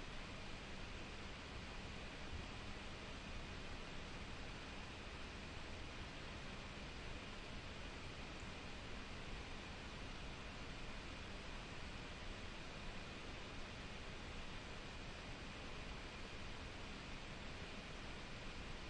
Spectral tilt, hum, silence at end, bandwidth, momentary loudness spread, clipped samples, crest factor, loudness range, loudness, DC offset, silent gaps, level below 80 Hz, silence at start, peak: -4 dB/octave; none; 0 s; 10.5 kHz; 0 LU; under 0.1%; 14 dB; 0 LU; -52 LUFS; under 0.1%; none; -56 dBFS; 0 s; -36 dBFS